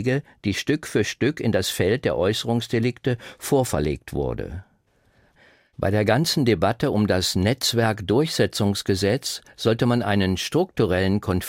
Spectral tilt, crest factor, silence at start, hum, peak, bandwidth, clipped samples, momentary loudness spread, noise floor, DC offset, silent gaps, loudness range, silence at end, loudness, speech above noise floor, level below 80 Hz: -5 dB/octave; 18 dB; 0 s; none; -4 dBFS; 16.5 kHz; under 0.1%; 7 LU; -62 dBFS; under 0.1%; none; 5 LU; 0 s; -22 LUFS; 40 dB; -46 dBFS